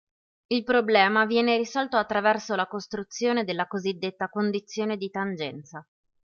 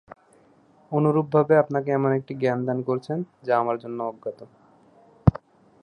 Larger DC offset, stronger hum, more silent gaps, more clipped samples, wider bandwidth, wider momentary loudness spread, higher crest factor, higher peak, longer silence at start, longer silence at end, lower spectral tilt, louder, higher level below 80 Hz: neither; neither; neither; neither; second, 7.2 kHz vs 9 kHz; about the same, 13 LU vs 12 LU; about the same, 20 dB vs 24 dB; second, -6 dBFS vs 0 dBFS; second, 0.5 s vs 0.9 s; about the same, 0.4 s vs 0.45 s; second, -4.5 dB/octave vs -10 dB/octave; about the same, -26 LUFS vs -24 LUFS; second, -68 dBFS vs -44 dBFS